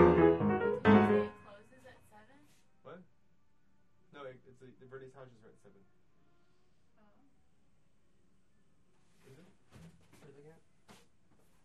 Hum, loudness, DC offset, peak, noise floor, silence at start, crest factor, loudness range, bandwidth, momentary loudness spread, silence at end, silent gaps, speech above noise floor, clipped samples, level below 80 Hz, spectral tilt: none; -28 LUFS; under 0.1%; -10 dBFS; -75 dBFS; 0 s; 26 dB; 26 LU; 7.2 kHz; 29 LU; 6.4 s; none; 20 dB; under 0.1%; -60 dBFS; -8.5 dB/octave